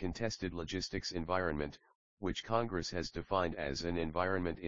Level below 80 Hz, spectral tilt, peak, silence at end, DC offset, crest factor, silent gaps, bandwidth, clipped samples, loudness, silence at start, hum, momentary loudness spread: -54 dBFS; -4 dB/octave; -18 dBFS; 0 s; 0.2%; 20 dB; 1.95-2.17 s; 7.4 kHz; under 0.1%; -37 LUFS; 0 s; none; 6 LU